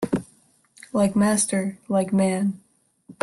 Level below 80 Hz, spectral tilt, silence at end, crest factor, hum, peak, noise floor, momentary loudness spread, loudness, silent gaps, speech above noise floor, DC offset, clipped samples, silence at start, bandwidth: -58 dBFS; -5.5 dB/octave; 0.1 s; 14 dB; none; -10 dBFS; -59 dBFS; 9 LU; -23 LUFS; none; 37 dB; under 0.1%; under 0.1%; 0 s; 12.5 kHz